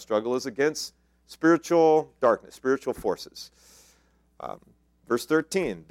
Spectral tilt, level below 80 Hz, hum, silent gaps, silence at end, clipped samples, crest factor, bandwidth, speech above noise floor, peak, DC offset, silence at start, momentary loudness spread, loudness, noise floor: -5 dB/octave; -62 dBFS; none; none; 0.1 s; under 0.1%; 20 dB; 16 kHz; 38 dB; -8 dBFS; under 0.1%; 0 s; 20 LU; -25 LUFS; -63 dBFS